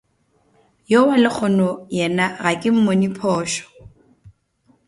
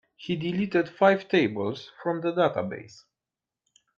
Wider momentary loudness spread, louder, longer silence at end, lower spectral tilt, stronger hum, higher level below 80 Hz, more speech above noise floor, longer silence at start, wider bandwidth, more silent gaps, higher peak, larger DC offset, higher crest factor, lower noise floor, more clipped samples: second, 7 LU vs 11 LU; first, -18 LUFS vs -26 LUFS; second, 0.6 s vs 1.1 s; second, -5.5 dB/octave vs -7 dB/octave; neither; first, -58 dBFS vs -68 dBFS; second, 45 dB vs 64 dB; first, 0.9 s vs 0.2 s; first, 11.5 kHz vs 7.4 kHz; neither; first, -2 dBFS vs -8 dBFS; neither; about the same, 18 dB vs 20 dB; second, -62 dBFS vs -90 dBFS; neither